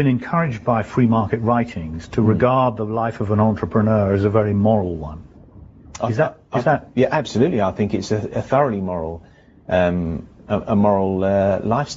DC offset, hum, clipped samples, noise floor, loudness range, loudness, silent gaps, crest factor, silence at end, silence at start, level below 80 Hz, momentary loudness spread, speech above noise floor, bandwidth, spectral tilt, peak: under 0.1%; none; under 0.1%; -43 dBFS; 3 LU; -19 LUFS; none; 18 dB; 0 s; 0 s; -44 dBFS; 10 LU; 24 dB; 7.8 kHz; -7 dB/octave; -2 dBFS